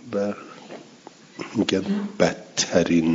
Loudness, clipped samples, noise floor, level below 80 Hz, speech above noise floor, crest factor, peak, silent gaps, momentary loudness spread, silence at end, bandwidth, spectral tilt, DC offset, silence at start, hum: -23 LUFS; under 0.1%; -47 dBFS; -62 dBFS; 25 dB; 22 dB; -2 dBFS; none; 21 LU; 0 s; 7.8 kHz; -4.5 dB/octave; under 0.1%; 0.05 s; none